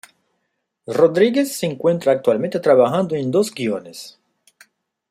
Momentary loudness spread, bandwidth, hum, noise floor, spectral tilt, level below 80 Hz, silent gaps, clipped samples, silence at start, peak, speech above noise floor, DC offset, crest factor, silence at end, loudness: 13 LU; 15.5 kHz; none; -73 dBFS; -5.5 dB/octave; -64 dBFS; none; under 0.1%; 0.9 s; -2 dBFS; 56 dB; under 0.1%; 18 dB; 1 s; -18 LUFS